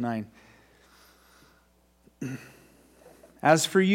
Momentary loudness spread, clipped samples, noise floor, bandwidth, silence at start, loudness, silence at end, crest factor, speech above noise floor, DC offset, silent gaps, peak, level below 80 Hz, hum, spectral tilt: 21 LU; under 0.1%; -63 dBFS; 16 kHz; 0 s; -26 LUFS; 0 s; 24 dB; 39 dB; under 0.1%; none; -6 dBFS; -68 dBFS; none; -4.5 dB/octave